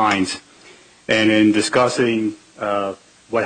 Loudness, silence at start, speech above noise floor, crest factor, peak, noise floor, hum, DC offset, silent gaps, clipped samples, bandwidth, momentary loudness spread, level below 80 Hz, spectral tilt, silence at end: -18 LUFS; 0 s; 29 dB; 14 dB; -4 dBFS; -47 dBFS; none; under 0.1%; none; under 0.1%; 9.4 kHz; 14 LU; -58 dBFS; -4 dB/octave; 0 s